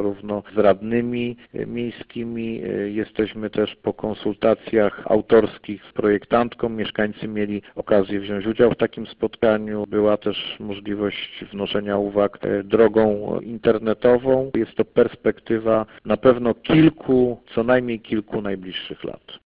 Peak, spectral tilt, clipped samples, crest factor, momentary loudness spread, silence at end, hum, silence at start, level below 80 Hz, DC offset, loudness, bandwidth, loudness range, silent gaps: -2 dBFS; -11 dB/octave; under 0.1%; 18 dB; 12 LU; 0.15 s; none; 0 s; -50 dBFS; under 0.1%; -21 LUFS; 5 kHz; 4 LU; none